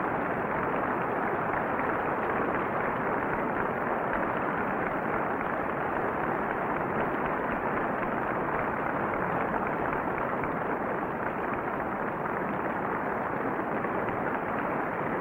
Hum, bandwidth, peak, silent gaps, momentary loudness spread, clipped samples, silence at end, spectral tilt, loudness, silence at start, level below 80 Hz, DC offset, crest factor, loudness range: none; 16 kHz; -16 dBFS; none; 2 LU; under 0.1%; 0 s; -8.5 dB/octave; -30 LUFS; 0 s; -54 dBFS; under 0.1%; 14 dB; 2 LU